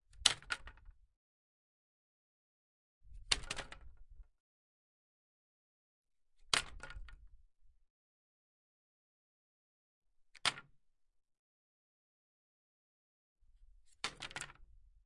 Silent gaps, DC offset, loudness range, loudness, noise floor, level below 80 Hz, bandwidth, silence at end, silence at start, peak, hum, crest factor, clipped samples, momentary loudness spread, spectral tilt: 1.16-3.01 s, 4.40-6.04 s, 7.90-10.02 s, 11.39-13.36 s; under 0.1%; 7 LU; -38 LUFS; -73 dBFS; -62 dBFS; 11.5 kHz; 0.25 s; 0.15 s; -8 dBFS; none; 40 dB; under 0.1%; 22 LU; 0 dB/octave